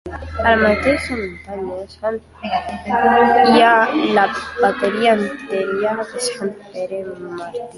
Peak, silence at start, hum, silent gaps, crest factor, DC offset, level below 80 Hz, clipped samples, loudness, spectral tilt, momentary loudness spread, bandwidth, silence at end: -2 dBFS; 0.05 s; none; none; 16 dB; under 0.1%; -40 dBFS; under 0.1%; -17 LUFS; -4.5 dB/octave; 16 LU; 11.5 kHz; 0 s